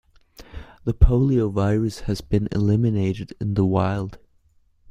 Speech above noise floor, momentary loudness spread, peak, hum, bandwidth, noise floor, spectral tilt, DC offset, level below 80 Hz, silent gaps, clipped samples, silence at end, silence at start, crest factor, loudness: 39 dB; 12 LU; -2 dBFS; none; 11 kHz; -59 dBFS; -8.5 dB/octave; under 0.1%; -30 dBFS; none; under 0.1%; 0.75 s; 0.4 s; 20 dB; -22 LUFS